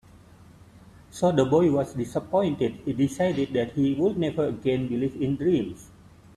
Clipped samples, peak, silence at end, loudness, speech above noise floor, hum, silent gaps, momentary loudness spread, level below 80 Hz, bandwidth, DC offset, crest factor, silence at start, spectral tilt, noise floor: under 0.1%; -8 dBFS; 0.5 s; -25 LUFS; 26 dB; none; none; 7 LU; -56 dBFS; 13 kHz; under 0.1%; 18 dB; 0.75 s; -7.5 dB/octave; -51 dBFS